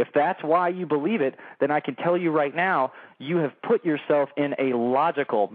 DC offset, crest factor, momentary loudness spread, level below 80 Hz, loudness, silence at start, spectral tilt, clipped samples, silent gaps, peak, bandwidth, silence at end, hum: under 0.1%; 14 dB; 4 LU; under -90 dBFS; -24 LUFS; 0 s; -5 dB/octave; under 0.1%; none; -10 dBFS; 4.7 kHz; 0 s; none